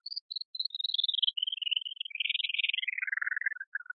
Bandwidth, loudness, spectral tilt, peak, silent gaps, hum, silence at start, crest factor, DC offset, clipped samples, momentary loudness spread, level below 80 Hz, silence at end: 5.2 kHz; -31 LUFS; 5.5 dB/octave; -14 dBFS; 0.21-0.29 s, 0.45-0.54 s, 3.67-3.72 s; none; 0.05 s; 22 dB; under 0.1%; under 0.1%; 9 LU; under -90 dBFS; 0.05 s